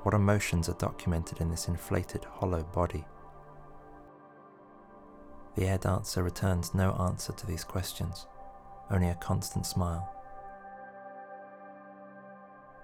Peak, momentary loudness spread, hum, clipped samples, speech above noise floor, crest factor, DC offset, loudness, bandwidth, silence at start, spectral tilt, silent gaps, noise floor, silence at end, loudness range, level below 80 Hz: -12 dBFS; 23 LU; none; under 0.1%; 24 dB; 22 dB; under 0.1%; -32 LUFS; 17 kHz; 0 s; -6 dB/octave; none; -54 dBFS; 0 s; 6 LU; -50 dBFS